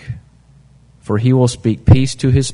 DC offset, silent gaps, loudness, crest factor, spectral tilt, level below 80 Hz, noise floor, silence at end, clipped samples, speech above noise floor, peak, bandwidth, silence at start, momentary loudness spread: under 0.1%; none; -14 LUFS; 14 dB; -7 dB/octave; -32 dBFS; -47 dBFS; 0 s; under 0.1%; 34 dB; 0 dBFS; 11 kHz; 0.05 s; 20 LU